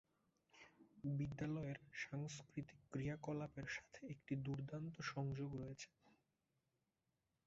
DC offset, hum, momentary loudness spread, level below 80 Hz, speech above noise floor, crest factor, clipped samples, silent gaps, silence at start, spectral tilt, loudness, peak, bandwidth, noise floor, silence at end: under 0.1%; none; 11 LU; -72 dBFS; 41 dB; 18 dB; under 0.1%; none; 0.55 s; -6.5 dB/octave; -49 LUFS; -32 dBFS; 7.6 kHz; -89 dBFS; 1.35 s